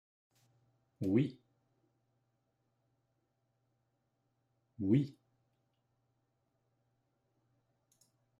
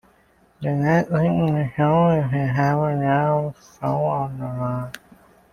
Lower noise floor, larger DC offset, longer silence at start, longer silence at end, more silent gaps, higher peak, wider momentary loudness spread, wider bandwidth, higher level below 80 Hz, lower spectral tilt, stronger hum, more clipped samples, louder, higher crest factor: first, -81 dBFS vs -58 dBFS; neither; first, 1 s vs 0.6 s; first, 3.3 s vs 0.55 s; neither; second, -18 dBFS vs -6 dBFS; about the same, 9 LU vs 11 LU; second, 11 kHz vs 12.5 kHz; second, -82 dBFS vs -52 dBFS; about the same, -9.5 dB/octave vs -9 dB/octave; neither; neither; second, -35 LUFS vs -21 LUFS; first, 24 dB vs 16 dB